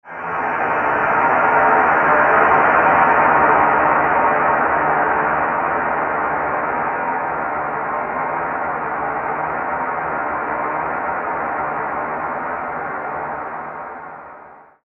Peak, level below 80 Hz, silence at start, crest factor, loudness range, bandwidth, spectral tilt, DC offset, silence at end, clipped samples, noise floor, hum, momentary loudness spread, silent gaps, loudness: 0 dBFS; -50 dBFS; 0.05 s; 18 dB; 10 LU; 6 kHz; -8 dB/octave; under 0.1%; 0.25 s; under 0.1%; -42 dBFS; none; 12 LU; none; -17 LUFS